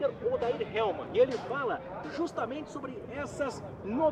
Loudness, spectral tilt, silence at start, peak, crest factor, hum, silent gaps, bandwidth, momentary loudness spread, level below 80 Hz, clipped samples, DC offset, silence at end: -33 LUFS; -6 dB/octave; 0 s; -14 dBFS; 18 dB; none; none; 10 kHz; 11 LU; -60 dBFS; under 0.1%; under 0.1%; 0 s